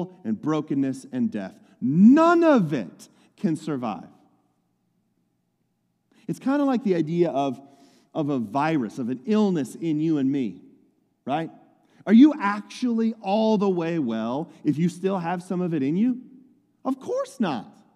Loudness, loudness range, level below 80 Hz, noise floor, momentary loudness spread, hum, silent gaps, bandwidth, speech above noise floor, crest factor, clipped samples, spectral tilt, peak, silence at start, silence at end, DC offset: -23 LUFS; 8 LU; -80 dBFS; -72 dBFS; 16 LU; none; none; 11.5 kHz; 50 dB; 20 dB; under 0.1%; -7.5 dB/octave; -4 dBFS; 0 s; 0.25 s; under 0.1%